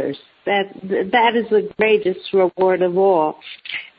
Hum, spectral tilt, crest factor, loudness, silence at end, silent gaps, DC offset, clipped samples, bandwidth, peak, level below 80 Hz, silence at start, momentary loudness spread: none; -9 dB/octave; 16 dB; -18 LUFS; 0.1 s; none; under 0.1%; under 0.1%; 5.2 kHz; -4 dBFS; -62 dBFS; 0 s; 12 LU